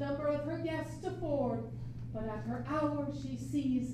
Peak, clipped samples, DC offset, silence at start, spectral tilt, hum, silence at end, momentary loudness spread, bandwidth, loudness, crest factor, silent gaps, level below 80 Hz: -22 dBFS; under 0.1%; under 0.1%; 0 s; -7.5 dB/octave; none; 0 s; 7 LU; 13 kHz; -37 LUFS; 14 dB; none; -54 dBFS